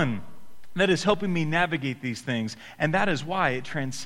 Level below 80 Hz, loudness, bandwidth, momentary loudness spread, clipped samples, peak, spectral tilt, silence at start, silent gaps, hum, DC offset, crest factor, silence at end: -54 dBFS; -26 LUFS; 14 kHz; 9 LU; under 0.1%; -8 dBFS; -5.5 dB/octave; 0 s; none; none; 1%; 20 dB; 0 s